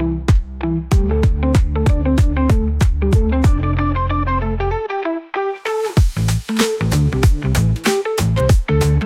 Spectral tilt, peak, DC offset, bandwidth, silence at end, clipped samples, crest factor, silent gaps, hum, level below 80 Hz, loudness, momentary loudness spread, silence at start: -6.5 dB/octave; -2 dBFS; under 0.1%; 16.5 kHz; 0 s; under 0.1%; 12 dB; none; none; -20 dBFS; -17 LUFS; 6 LU; 0 s